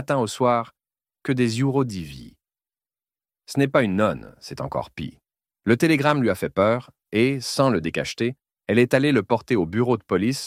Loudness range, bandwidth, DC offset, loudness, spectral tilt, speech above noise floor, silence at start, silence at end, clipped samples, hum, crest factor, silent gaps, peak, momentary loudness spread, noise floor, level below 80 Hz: 5 LU; 16 kHz; under 0.1%; -22 LUFS; -6 dB/octave; over 68 dB; 0 s; 0 s; under 0.1%; none; 20 dB; none; -2 dBFS; 15 LU; under -90 dBFS; -54 dBFS